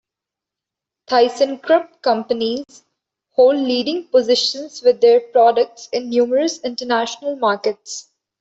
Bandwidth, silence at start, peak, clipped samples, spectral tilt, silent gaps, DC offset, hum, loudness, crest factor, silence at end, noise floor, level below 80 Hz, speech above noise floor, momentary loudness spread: 8 kHz; 1.1 s; -2 dBFS; under 0.1%; -3 dB/octave; none; under 0.1%; none; -17 LUFS; 16 dB; 0.4 s; -86 dBFS; -66 dBFS; 69 dB; 10 LU